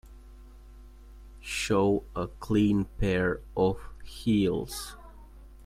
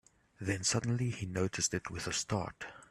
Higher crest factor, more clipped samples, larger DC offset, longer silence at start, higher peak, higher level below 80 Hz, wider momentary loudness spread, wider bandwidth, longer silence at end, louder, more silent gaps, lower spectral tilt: about the same, 16 dB vs 18 dB; neither; neither; second, 0.05 s vs 0.4 s; first, -14 dBFS vs -18 dBFS; first, -44 dBFS vs -62 dBFS; first, 16 LU vs 9 LU; first, 16 kHz vs 14 kHz; about the same, 0 s vs 0.05 s; first, -28 LUFS vs -35 LUFS; neither; first, -6 dB/octave vs -3.5 dB/octave